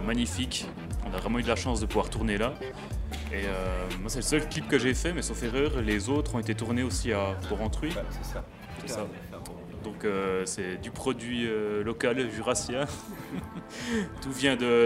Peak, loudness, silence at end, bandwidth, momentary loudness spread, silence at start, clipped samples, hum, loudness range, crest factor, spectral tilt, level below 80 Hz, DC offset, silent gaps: -8 dBFS; -31 LUFS; 0 s; 16 kHz; 11 LU; 0 s; under 0.1%; none; 5 LU; 20 dB; -4.5 dB/octave; -40 dBFS; under 0.1%; none